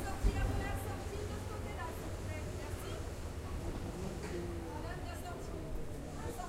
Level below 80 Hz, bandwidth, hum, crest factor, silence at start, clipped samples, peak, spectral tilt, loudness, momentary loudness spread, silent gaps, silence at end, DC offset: -44 dBFS; 16 kHz; none; 20 dB; 0 s; under 0.1%; -18 dBFS; -5.5 dB/octave; -42 LUFS; 7 LU; none; 0 s; under 0.1%